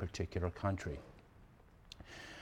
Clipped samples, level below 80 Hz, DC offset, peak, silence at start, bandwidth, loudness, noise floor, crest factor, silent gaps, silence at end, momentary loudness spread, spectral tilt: under 0.1%; -56 dBFS; under 0.1%; -20 dBFS; 0 s; 11 kHz; -42 LUFS; -62 dBFS; 22 dB; none; 0 s; 24 LU; -6 dB/octave